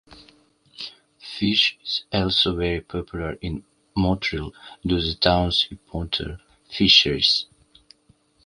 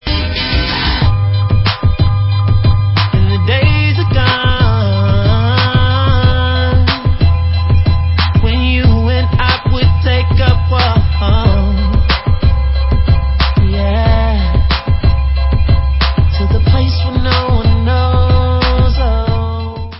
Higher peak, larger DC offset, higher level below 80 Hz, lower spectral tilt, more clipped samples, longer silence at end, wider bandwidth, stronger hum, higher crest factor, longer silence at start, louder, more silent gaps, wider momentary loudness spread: about the same, -2 dBFS vs 0 dBFS; neither; second, -40 dBFS vs -14 dBFS; second, -4.5 dB/octave vs -9.5 dB/octave; neither; first, 1 s vs 0 s; first, 11 kHz vs 5.8 kHz; neither; first, 24 dB vs 10 dB; about the same, 0.1 s vs 0.05 s; second, -21 LUFS vs -12 LUFS; neither; first, 20 LU vs 3 LU